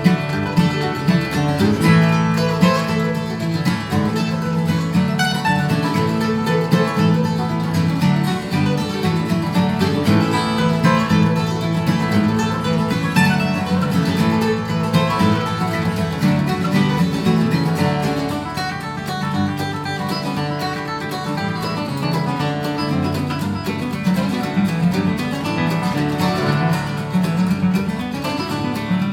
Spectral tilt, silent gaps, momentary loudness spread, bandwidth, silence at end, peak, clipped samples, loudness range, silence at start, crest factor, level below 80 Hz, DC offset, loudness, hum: -6.5 dB/octave; none; 6 LU; 16.5 kHz; 0 s; -2 dBFS; under 0.1%; 5 LU; 0 s; 16 dB; -46 dBFS; under 0.1%; -19 LUFS; none